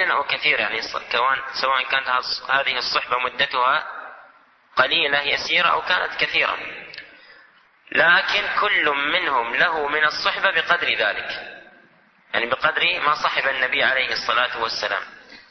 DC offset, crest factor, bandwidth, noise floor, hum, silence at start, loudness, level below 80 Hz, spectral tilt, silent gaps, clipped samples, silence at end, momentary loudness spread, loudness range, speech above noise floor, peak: under 0.1%; 18 dB; 6.4 kHz; -55 dBFS; none; 0 s; -20 LUFS; -60 dBFS; -2 dB/octave; none; under 0.1%; 0.1 s; 9 LU; 2 LU; 34 dB; -4 dBFS